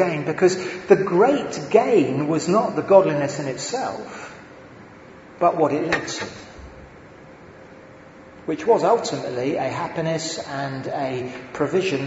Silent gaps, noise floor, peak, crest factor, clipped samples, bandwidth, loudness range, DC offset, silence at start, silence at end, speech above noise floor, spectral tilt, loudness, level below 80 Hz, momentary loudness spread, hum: none; -44 dBFS; 0 dBFS; 22 dB; under 0.1%; 8 kHz; 7 LU; under 0.1%; 0 s; 0 s; 23 dB; -5.5 dB/octave; -21 LUFS; -56 dBFS; 17 LU; none